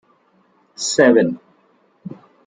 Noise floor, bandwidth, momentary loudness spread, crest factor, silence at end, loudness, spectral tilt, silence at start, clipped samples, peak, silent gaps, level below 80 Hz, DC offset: -58 dBFS; 9.6 kHz; 24 LU; 18 dB; 0.4 s; -16 LUFS; -4 dB/octave; 0.8 s; under 0.1%; -2 dBFS; none; -68 dBFS; under 0.1%